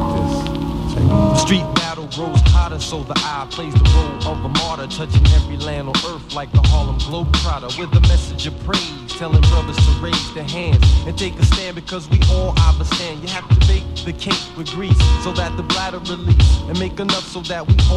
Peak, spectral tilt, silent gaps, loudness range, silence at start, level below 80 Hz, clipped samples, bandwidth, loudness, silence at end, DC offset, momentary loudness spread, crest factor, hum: 0 dBFS; -5.5 dB/octave; none; 1 LU; 0 s; -20 dBFS; under 0.1%; 11 kHz; -17 LUFS; 0 s; under 0.1%; 10 LU; 16 dB; none